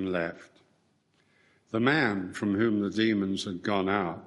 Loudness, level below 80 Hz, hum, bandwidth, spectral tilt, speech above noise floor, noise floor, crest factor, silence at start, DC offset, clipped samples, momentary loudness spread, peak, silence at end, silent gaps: -28 LUFS; -68 dBFS; none; 11.5 kHz; -6 dB/octave; 41 dB; -69 dBFS; 20 dB; 0 s; under 0.1%; under 0.1%; 7 LU; -10 dBFS; 0 s; none